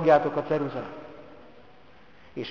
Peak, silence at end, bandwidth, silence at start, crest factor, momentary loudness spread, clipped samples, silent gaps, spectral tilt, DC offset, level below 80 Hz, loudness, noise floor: -6 dBFS; 0 s; 7 kHz; 0 s; 22 dB; 25 LU; under 0.1%; none; -7.5 dB/octave; 0.3%; -62 dBFS; -27 LUFS; -55 dBFS